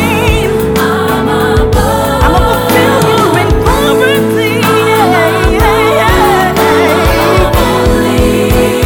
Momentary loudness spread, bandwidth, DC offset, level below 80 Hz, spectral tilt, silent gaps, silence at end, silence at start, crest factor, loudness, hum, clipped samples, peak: 3 LU; 19.5 kHz; under 0.1%; -18 dBFS; -5.5 dB/octave; none; 0 s; 0 s; 8 dB; -9 LUFS; none; under 0.1%; 0 dBFS